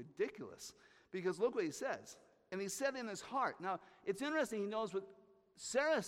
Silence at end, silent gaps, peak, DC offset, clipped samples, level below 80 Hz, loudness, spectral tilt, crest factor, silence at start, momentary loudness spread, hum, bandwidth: 0 s; none; -24 dBFS; under 0.1%; under 0.1%; -80 dBFS; -41 LUFS; -3.5 dB/octave; 18 dB; 0 s; 13 LU; none; 16 kHz